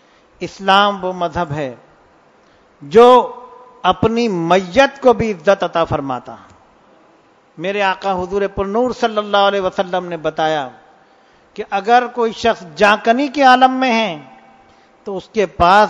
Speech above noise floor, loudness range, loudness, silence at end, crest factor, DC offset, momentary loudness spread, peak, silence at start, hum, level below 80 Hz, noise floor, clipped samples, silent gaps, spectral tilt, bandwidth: 36 dB; 6 LU; -15 LUFS; 0 s; 16 dB; under 0.1%; 15 LU; 0 dBFS; 0.4 s; none; -46 dBFS; -51 dBFS; 0.2%; none; -5 dB/octave; 10 kHz